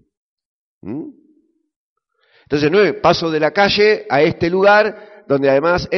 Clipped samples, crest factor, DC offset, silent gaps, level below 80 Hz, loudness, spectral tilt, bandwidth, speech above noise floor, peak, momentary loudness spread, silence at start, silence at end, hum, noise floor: under 0.1%; 16 dB; under 0.1%; 1.76-1.96 s; -48 dBFS; -14 LUFS; -3 dB/octave; 6.6 kHz; 44 dB; -2 dBFS; 17 LU; 0.85 s; 0 s; none; -59 dBFS